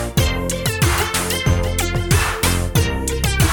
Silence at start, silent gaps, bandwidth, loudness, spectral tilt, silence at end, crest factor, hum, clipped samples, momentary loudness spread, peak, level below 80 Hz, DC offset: 0 s; none; 19.5 kHz; -18 LUFS; -4 dB/octave; 0 s; 16 dB; none; under 0.1%; 4 LU; -2 dBFS; -24 dBFS; under 0.1%